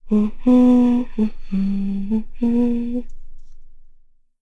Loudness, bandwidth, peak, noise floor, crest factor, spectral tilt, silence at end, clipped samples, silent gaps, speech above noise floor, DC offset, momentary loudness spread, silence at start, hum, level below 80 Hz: -19 LUFS; 4.7 kHz; -6 dBFS; -48 dBFS; 14 dB; -9.5 dB/octave; 0.55 s; under 0.1%; none; 32 dB; under 0.1%; 11 LU; 0.05 s; none; -32 dBFS